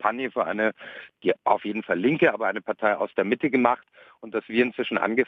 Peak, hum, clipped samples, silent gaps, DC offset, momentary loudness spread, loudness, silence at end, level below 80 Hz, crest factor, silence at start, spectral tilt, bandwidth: -4 dBFS; none; under 0.1%; none; under 0.1%; 8 LU; -25 LUFS; 0.05 s; -70 dBFS; 20 dB; 0 s; -8 dB/octave; 6 kHz